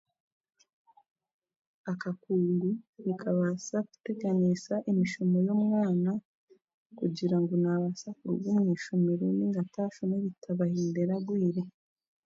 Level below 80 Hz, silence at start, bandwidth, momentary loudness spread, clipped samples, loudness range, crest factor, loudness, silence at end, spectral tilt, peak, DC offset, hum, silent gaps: -76 dBFS; 1.85 s; 7.8 kHz; 8 LU; under 0.1%; 4 LU; 14 dB; -30 LUFS; 0.55 s; -8 dB/octave; -18 dBFS; under 0.1%; none; 2.89-2.93 s, 6.25-6.47 s, 6.74-6.90 s